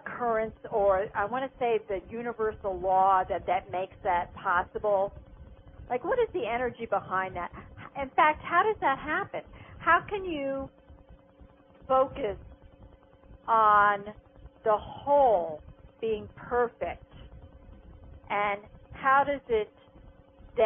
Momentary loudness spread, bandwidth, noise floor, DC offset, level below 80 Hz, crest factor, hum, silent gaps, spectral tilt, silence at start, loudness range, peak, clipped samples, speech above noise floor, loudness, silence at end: 14 LU; 3.7 kHz; -56 dBFS; under 0.1%; -54 dBFS; 20 dB; none; none; -9 dB/octave; 0.05 s; 6 LU; -10 dBFS; under 0.1%; 28 dB; -28 LUFS; 0 s